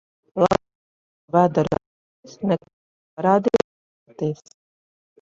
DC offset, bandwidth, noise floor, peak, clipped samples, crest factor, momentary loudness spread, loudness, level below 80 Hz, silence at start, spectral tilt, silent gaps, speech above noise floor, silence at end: under 0.1%; 7.8 kHz; under -90 dBFS; -4 dBFS; under 0.1%; 20 dB; 12 LU; -22 LUFS; -54 dBFS; 0.35 s; -7.5 dB/octave; 0.75-1.28 s, 1.86-2.23 s, 2.73-3.17 s, 3.64-4.06 s; over 70 dB; 0.85 s